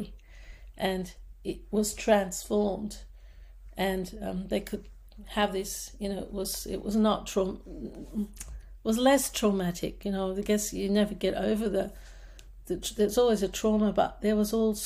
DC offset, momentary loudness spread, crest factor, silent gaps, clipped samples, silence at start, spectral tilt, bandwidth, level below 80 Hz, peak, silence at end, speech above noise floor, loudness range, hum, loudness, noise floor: under 0.1%; 14 LU; 18 dB; none; under 0.1%; 0 s; -4.5 dB/octave; 15.5 kHz; -46 dBFS; -10 dBFS; 0 s; 20 dB; 5 LU; none; -29 LUFS; -49 dBFS